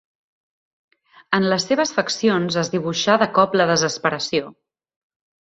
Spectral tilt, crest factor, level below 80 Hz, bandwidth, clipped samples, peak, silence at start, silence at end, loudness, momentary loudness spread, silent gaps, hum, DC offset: -4 dB/octave; 20 dB; -62 dBFS; 8.2 kHz; under 0.1%; -2 dBFS; 1.3 s; 0.9 s; -19 LUFS; 6 LU; none; none; under 0.1%